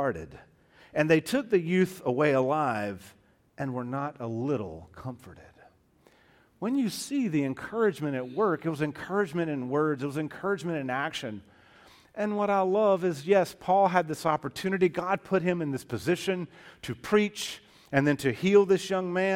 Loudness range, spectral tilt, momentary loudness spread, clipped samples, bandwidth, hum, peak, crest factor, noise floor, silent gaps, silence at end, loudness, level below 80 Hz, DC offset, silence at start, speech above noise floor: 8 LU; -6 dB/octave; 13 LU; under 0.1%; 16.5 kHz; none; -8 dBFS; 20 dB; -62 dBFS; none; 0 s; -28 LUFS; -64 dBFS; under 0.1%; 0 s; 35 dB